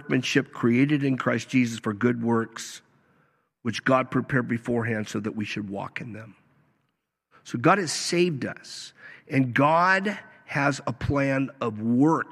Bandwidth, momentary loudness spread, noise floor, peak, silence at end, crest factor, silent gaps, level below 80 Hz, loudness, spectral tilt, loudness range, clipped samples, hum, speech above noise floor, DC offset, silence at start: 13 kHz; 15 LU; -77 dBFS; -6 dBFS; 0 s; 20 dB; none; -56 dBFS; -25 LUFS; -5.5 dB/octave; 5 LU; under 0.1%; none; 52 dB; under 0.1%; 0 s